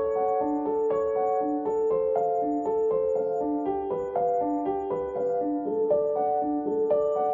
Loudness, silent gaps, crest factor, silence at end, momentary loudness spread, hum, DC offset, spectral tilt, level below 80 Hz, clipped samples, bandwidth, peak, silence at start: -27 LUFS; none; 12 dB; 0 s; 4 LU; none; under 0.1%; -9 dB/octave; -60 dBFS; under 0.1%; 7.2 kHz; -14 dBFS; 0 s